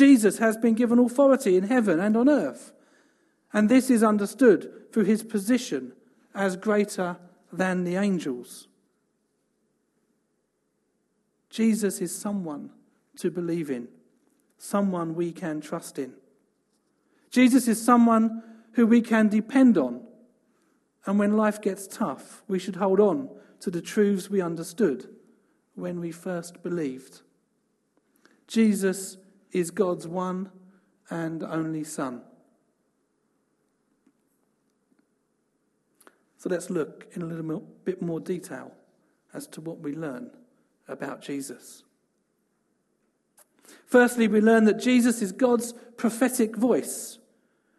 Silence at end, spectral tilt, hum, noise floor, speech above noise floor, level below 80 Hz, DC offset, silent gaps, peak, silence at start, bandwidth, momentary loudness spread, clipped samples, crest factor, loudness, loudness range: 0.65 s; -5.5 dB/octave; none; -74 dBFS; 50 dB; -74 dBFS; under 0.1%; none; -6 dBFS; 0 s; 13 kHz; 19 LU; under 0.1%; 20 dB; -25 LUFS; 15 LU